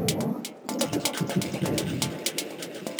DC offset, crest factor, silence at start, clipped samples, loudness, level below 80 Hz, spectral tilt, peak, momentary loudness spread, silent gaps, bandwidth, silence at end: under 0.1%; 20 dB; 0 s; under 0.1%; -29 LUFS; -58 dBFS; -4 dB/octave; -10 dBFS; 7 LU; none; over 20 kHz; 0 s